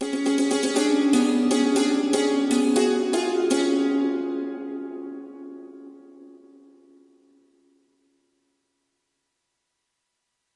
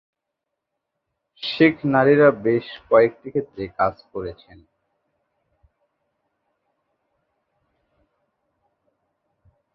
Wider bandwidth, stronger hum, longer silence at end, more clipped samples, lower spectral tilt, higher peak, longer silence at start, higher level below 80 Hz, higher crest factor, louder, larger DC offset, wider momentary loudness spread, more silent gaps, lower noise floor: first, 11.5 kHz vs 5.8 kHz; neither; second, 4.2 s vs 5.4 s; neither; second, -3 dB/octave vs -9 dB/octave; second, -8 dBFS vs -2 dBFS; second, 0 s vs 1.4 s; second, -74 dBFS vs -58 dBFS; second, 16 dB vs 22 dB; second, -22 LUFS vs -19 LUFS; neither; about the same, 18 LU vs 17 LU; neither; second, -78 dBFS vs -82 dBFS